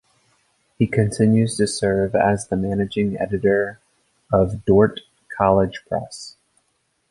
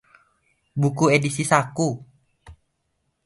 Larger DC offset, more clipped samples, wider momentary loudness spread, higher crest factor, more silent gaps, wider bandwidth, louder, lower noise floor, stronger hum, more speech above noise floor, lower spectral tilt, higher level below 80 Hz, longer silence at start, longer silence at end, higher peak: neither; neither; about the same, 11 LU vs 11 LU; second, 18 dB vs 24 dB; neither; about the same, 11.5 kHz vs 11.5 kHz; about the same, -20 LUFS vs -21 LUFS; second, -69 dBFS vs -73 dBFS; neither; about the same, 50 dB vs 53 dB; about the same, -6.5 dB/octave vs -5.5 dB/octave; first, -44 dBFS vs -58 dBFS; about the same, 0.8 s vs 0.75 s; about the same, 0.8 s vs 0.7 s; about the same, -2 dBFS vs -2 dBFS